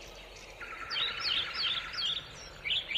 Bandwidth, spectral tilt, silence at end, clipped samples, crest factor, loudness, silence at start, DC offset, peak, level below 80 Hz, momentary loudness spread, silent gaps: 15.5 kHz; -1 dB/octave; 0 s; under 0.1%; 16 dB; -32 LUFS; 0 s; under 0.1%; -20 dBFS; -58 dBFS; 17 LU; none